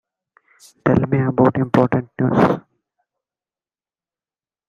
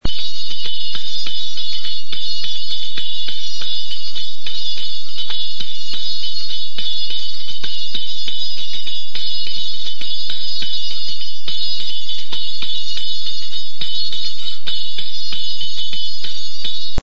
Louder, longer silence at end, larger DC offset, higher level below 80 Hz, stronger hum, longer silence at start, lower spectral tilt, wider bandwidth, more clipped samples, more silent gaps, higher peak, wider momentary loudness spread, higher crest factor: first, -18 LUFS vs -24 LUFS; first, 2.1 s vs 0 s; second, under 0.1% vs 50%; second, -52 dBFS vs -42 dBFS; neither; first, 0.85 s vs 0 s; first, -9 dB/octave vs -2.5 dB/octave; first, 9.6 kHz vs 8 kHz; neither; neither; about the same, 0 dBFS vs -2 dBFS; about the same, 5 LU vs 3 LU; about the same, 20 dB vs 20 dB